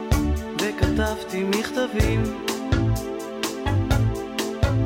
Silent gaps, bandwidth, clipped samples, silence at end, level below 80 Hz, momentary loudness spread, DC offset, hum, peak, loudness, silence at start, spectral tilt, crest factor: none; 17 kHz; under 0.1%; 0 s; -30 dBFS; 5 LU; under 0.1%; none; -8 dBFS; -24 LUFS; 0 s; -5.5 dB/octave; 14 dB